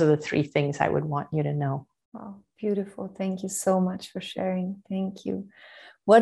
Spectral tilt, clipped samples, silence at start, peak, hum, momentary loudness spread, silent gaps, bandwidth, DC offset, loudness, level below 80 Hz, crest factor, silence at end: -6 dB/octave; under 0.1%; 0 s; -4 dBFS; none; 18 LU; 2.05-2.12 s; 12.5 kHz; under 0.1%; -28 LUFS; -64 dBFS; 22 dB; 0 s